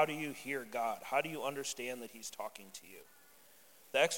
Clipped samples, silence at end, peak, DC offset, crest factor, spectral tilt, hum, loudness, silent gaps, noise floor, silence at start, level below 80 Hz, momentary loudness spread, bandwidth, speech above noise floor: under 0.1%; 0 s; -16 dBFS; under 0.1%; 22 dB; -2.5 dB/octave; none; -39 LUFS; none; -63 dBFS; 0 s; -82 dBFS; 16 LU; 17 kHz; 23 dB